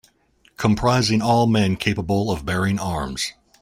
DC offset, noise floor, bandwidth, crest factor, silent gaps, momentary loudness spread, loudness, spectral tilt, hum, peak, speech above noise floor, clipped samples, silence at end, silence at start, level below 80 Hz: under 0.1%; -59 dBFS; 16 kHz; 18 dB; none; 8 LU; -21 LUFS; -5.5 dB/octave; none; -4 dBFS; 40 dB; under 0.1%; 0.3 s; 0.6 s; -42 dBFS